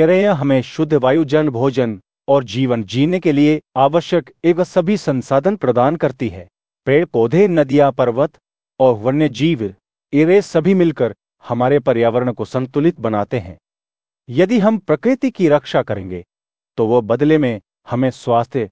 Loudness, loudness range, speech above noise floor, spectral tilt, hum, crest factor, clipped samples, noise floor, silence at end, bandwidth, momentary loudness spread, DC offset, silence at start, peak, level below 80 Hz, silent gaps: -16 LUFS; 2 LU; over 75 dB; -7.5 dB/octave; none; 14 dB; under 0.1%; under -90 dBFS; 0.05 s; 8 kHz; 9 LU; 0.3%; 0 s; 0 dBFS; -52 dBFS; none